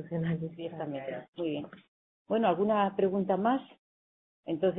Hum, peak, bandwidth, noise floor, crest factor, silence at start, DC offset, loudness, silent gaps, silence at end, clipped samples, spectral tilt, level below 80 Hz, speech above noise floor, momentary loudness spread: none; -14 dBFS; 3.9 kHz; under -90 dBFS; 18 dB; 0 s; under 0.1%; -31 LUFS; 1.28-1.33 s, 1.88-2.25 s, 3.79-4.43 s; 0 s; under 0.1%; -11 dB/octave; -70 dBFS; over 59 dB; 12 LU